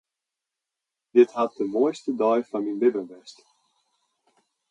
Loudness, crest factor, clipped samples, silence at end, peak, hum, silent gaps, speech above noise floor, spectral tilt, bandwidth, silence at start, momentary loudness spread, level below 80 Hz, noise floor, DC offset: -24 LUFS; 20 dB; under 0.1%; 1.4 s; -6 dBFS; none; none; 64 dB; -6 dB/octave; 8.8 kHz; 1.15 s; 9 LU; -80 dBFS; -87 dBFS; under 0.1%